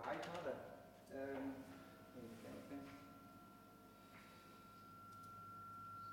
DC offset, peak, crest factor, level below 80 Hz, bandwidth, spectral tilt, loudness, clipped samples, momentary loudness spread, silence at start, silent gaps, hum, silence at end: under 0.1%; -32 dBFS; 20 dB; -80 dBFS; 16.5 kHz; -5.5 dB/octave; -54 LUFS; under 0.1%; 14 LU; 0 s; none; 50 Hz at -70 dBFS; 0 s